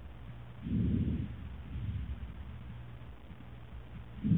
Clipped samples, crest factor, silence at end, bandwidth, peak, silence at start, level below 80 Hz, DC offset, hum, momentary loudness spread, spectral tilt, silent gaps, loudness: under 0.1%; 20 dB; 0 s; 4 kHz; -18 dBFS; 0 s; -46 dBFS; 0.2%; none; 18 LU; -10.5 dB/octave; none; -40 LUFS